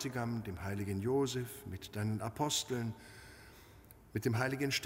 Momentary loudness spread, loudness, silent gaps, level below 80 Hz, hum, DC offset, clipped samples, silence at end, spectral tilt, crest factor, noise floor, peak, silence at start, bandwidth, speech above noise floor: 20 LU; -37 LUFS; none; -62 dBFS; none; under 0.1%; under 0.1%; 0 s; -4.5 dB/octave; 18 dB; -59 dBFS; -20 dBFS; 0 s; 16 kHz; 22 dB